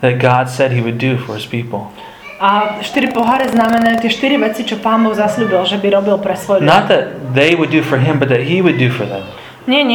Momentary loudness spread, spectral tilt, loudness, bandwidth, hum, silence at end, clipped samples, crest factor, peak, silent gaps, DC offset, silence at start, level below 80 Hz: 10 LU; -6 dB/octave; -13 LUFS; 19 kHz; none; 0 s; under 0.1%; 14 dB; 0 dBFS; none; under 0.1%; 0 s; -52 dBFS